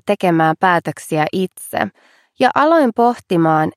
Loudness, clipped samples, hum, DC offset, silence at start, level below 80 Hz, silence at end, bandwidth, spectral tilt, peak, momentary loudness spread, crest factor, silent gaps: -16 LUFS; under 0.1%; none; under 0.1%; 0.05 s; -62 dBFS; 0.05 s; 15 kHz; -6 dB/octave; 0 dBFS; 9 LU; 16 dB; none